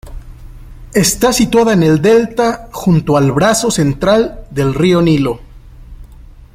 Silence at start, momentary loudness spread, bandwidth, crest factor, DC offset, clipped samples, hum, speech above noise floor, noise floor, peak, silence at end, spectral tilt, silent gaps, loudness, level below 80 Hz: 0.05 s; 8 LU; 16.5 kHz; 12 dB; under 0.1%; under 0.1%; none; 25 dB; -36 dBFS; 0 dBFS; 0.3 s; -5 dB/octave; none; -12 LUFS; -34 dBFS